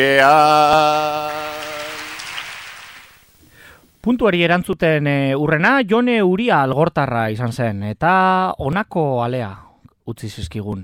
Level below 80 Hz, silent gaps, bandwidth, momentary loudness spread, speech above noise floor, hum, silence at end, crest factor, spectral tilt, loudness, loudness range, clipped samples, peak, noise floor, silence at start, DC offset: -46 dBFS; none; 16.5 kHz; 17 LU; 33 dB; none; 0 s; 18 dB; -6 dB/octave; -17 LUFS; 6 LU; under 0.1%; 0 dBFS; -49 dBFS; 0 s; under 0.1%